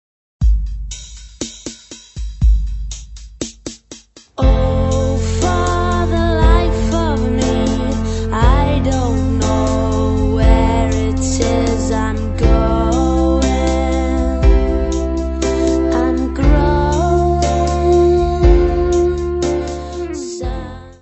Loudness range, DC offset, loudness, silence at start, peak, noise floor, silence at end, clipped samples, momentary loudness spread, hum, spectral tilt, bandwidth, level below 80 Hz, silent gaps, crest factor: 6 LU; under 0.1%; -16 LUFS; 0.4 s; 0 dBFS; -40 dBFS; 0.1 s; under 0.1%; 15 LU; none; -6.5 dB/octave; 8.4 kHz; -18 dBFS; none; 14 dB